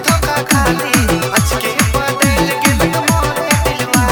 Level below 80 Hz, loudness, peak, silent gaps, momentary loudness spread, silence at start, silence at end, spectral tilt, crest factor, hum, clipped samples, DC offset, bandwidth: -24 dBFS; -13 LUFS; 0 dBFS; none; 2 LU; 0 s; 0 s; -4 dB/octave; 14 dB; none; under 0.1%; under 0.1%; 18.5 kHz